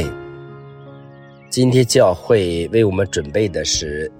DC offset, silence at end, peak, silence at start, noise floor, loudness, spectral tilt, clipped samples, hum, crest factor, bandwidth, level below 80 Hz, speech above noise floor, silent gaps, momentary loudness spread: under 0.1%; 0.1 s; -2 dBFS; 0 s; -41 dBFS; -17 LUFS; -5 dB/octave; under 0.1%; none; 16 dB; 16.5 kHz; -40 dBFS; 25 dB; none; 21 LU